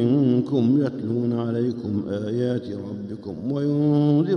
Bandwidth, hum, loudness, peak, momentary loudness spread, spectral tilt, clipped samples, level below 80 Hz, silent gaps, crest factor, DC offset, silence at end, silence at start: 6.4 kHz; none; -23 LUFS; -8 dBFS; 13 LU; -10 dB/octave; under 0.1%; -62 dBFS; none; 14 dB; under 0.1%; 0 s; 0 s